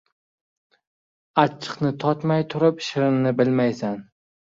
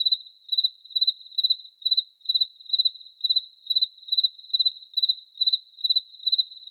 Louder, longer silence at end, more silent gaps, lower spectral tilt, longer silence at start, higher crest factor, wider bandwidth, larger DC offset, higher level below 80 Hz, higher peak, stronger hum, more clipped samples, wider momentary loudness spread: about the same, -22 LUFS vs -23 LUFS; first, 0.5 s vs 0.05 s; neither; first, -7 dB/octave vs 5.5 dB/octave; first, 1.35 s vs 0 s; first, 22 dB vs 14 dB; second, 7.6 kHz vs 17 kHz; neither; first, -64 dBFS vs under -90 dBFS; first, 0 dBFS vs -12 dBFS; neither; neither; first, 7 LU vs 3 LU